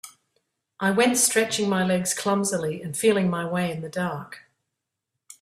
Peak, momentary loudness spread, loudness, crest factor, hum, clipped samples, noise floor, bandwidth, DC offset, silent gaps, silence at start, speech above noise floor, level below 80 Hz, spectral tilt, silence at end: -6 dBFS; 10 LU; -23 LUFS; 18 dB; none; under 0.1%; -83 dBFS; 15 kHz; under 0.1%; none; 0.05 s; 59 dB; -66 dBFS; -4 dB/octave; 0.1 s